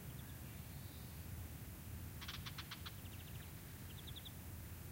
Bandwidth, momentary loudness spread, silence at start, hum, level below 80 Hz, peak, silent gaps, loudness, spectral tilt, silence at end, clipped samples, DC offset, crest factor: 16 kHz; 3 LU; 0 s; none; -58 dBFS; -34 dBFS; none; -51 LUFS; -4 dB/octave; 0 s; under 0.1%; under 0.1%; 16 dB